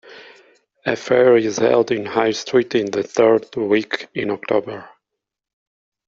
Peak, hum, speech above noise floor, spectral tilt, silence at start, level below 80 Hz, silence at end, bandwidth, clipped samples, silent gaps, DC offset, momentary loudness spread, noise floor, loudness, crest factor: -2 dBFS; none; 65 dB; -5 dB/octave; 0.1 s; -60 dBFS; 1.2 s; 7.6 kHz; under 0.1%; none; under 0.1%; 10 LU; -82 dBFS; -18 LUFS; 18 dB